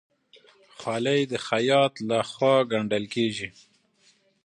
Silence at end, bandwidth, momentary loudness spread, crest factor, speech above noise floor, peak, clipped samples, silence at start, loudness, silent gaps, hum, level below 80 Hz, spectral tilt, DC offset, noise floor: 0.95 s; 11 kHz; 10 LU; 18 dB; 39 dB; -8 dBFS; under 0.1%; 0.8 s; -25 LUFS; none; none; -68 dBFS; -5 dB/octave; under 0.1%; -63 dBFS